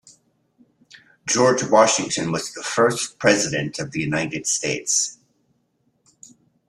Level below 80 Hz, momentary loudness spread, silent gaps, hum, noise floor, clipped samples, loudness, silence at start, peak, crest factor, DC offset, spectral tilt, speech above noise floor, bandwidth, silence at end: -60 dBFS; 10 LU; none; none; -67 dBFS; under 0.1%; -20 LUFS; 1.25 s; -2 dBFS; 20 dB; under 0.1%; -3 dB/octave; 47 dB; 13.5 kHz; 1.55 s